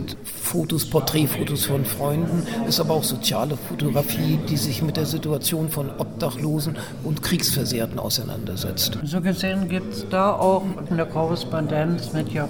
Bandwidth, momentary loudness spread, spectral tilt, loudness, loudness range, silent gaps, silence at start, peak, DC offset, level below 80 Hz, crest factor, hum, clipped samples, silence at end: 19 kHz; 6 LU; -5 dB/octave; -23 LUFS; 2 LU; none; 0 s; -6 dBFS; 0.6%; -48 dBFS; 16 dB; none; under 0.1%; 0 s